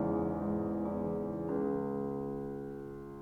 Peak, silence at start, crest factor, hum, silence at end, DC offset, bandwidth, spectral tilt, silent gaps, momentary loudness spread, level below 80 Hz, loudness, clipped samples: -22 dBFS; 0 s; 14 dB; none; 0 s; under 0.1%; 4.5 kHz; -10.5 dB/octave; none; 9 LU; -58 dBFS; -37 LUFS; under 0.1%